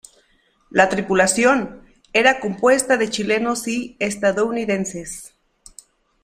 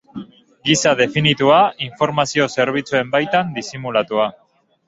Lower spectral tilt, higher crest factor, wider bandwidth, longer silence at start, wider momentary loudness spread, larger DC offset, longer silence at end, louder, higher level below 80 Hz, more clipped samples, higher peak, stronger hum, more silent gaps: about the same, -3.5 dB/octave vs -4 dB/octave; about the same, 20 dB vs 16 dB; first, 15 kHz vs 8.2 kHz; first, 0.75 s vs 0.15 s; about the same, 11 LU vs 11 LU; neither; first, 0.95 s vs 0.55 s; about the same, -19 LUFS vs -17 LUFS; about the same, -54 dBFS vs -56 dBFS; neither; about the same, 0 dBFS vs -2 dBFS; neither; neither